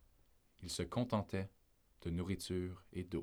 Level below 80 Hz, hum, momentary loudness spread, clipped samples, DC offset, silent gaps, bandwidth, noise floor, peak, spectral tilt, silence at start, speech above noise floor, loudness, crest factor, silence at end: -60 dBFS; none; 11 LU; under 0.1%; under 0.1%; none; over 20 kHz; -71 dBFS; -24 dBFS; -5.5 dB/octave; 0.6 s; 30 dB; -42 LUFS; 20 dB; 0 s